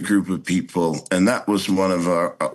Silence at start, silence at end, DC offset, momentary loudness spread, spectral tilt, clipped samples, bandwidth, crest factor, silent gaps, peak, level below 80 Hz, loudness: 0 s; 0 s; under 0.1%; 4 LU; -5.5 dB/octave; under 0.1%; 12.5 kHz; 16 dB; none; -4 dBFS; -60 dBFS; -21 LUFS